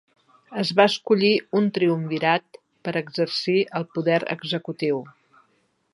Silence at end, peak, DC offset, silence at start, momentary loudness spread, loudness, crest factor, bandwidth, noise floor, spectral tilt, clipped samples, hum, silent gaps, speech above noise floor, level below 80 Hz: 0.85 s; -2 dBFS; under 0.1%; 0.5 s; 9 LU; -23 LUFS; 22 dB; 11.5 kHz; -67 dBFS; -6 dB/octave; under 0.1%; none; none; 45 dB; -74 dBFS